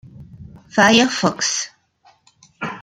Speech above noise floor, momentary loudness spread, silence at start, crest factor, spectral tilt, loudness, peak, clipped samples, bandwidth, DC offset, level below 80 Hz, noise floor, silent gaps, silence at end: 40 dB; 18 LU; 0.2 s; 20 dB; -3 dB/octave; -16 LUFS; 0 dBFS; under 0.1%; 15 kHz; under 0.1%; -56 dBFS; -56 dBFS; none; 0 s